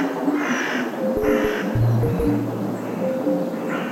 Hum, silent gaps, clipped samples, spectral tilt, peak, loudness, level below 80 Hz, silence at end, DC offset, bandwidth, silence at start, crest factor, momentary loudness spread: none; none; under 0.1%; -7 dB/octave; -8 dBFS; -22 LUFS; -40 dBFS; 0 s; under 0.1%; 16.5 kHz; 0 s; 14 dB; 6 LU